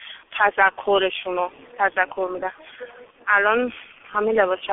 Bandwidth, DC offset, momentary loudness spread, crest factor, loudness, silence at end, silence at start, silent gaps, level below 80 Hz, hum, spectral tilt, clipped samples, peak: 3.9 kHz; under 0.1%; 20 LU; 20 dB; -21 LUFS; 0 s; 0 s; none; -60 dBFS; none; 3.5 dB/octave; under 0.1%; -2 dBFS